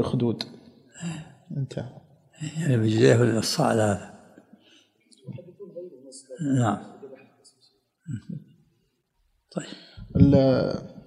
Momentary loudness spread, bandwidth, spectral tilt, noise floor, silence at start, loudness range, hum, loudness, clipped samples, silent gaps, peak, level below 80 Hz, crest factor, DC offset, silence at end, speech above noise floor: 24 LU; 14.5 kHz; -6.5 dB/octave; -71 dBFS; 0 s; 8 LU; none; -24 LUFS; under 0.1%; none; -4 dBFS; -48 dBFS; 24 dB; under 0.1%; 0.05 s; 47 dB